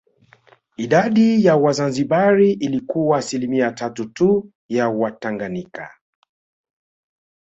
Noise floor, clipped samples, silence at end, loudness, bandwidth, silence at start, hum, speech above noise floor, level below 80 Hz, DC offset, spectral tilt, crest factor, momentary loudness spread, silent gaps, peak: -53 dBFS; under 0.1%; 1.6 s; -18 LUFS; 8.2 kHz; 0.8 s; none; 36 dB; -60 dBFS; under 0.1%; -6.5 dB/octave; 16 dB; 13 LU; 4.55-4.69 s; -2 dBFS